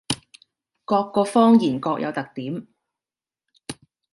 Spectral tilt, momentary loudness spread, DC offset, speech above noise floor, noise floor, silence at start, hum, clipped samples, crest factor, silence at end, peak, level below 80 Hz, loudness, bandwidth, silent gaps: -5.5 dB/octave; 23 LU; under 0.1%; over 70 dB; under -90 dBFS; 0.1 s; none; under 0.1%; 20 dB; 0.4 s; -4 dBFS; -62 dBFS; -21 LUFS; 11.5 kHz; none